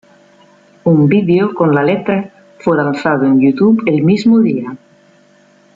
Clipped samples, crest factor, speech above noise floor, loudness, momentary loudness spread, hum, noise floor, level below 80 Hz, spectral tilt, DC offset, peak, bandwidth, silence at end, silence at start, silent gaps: under 0.1%; 12 dB; 37 dB; -12 LUFS; 9 LU; none; -48 dBFS; -56 dBFS; -8.5 dB/octave; under 0.1%; -2 dBFS; 7.6 kHz; 1 s; 0.85 s; none